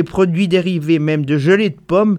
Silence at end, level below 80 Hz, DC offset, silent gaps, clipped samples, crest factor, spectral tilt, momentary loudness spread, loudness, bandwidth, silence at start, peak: 0 s; -48 dBFS; under 0.1%; none; under 0.1%; 12 dB; -7.5 dB/octave; 3 LU; -15 LUFS; 11 kHz; 0 s; -2 dBFS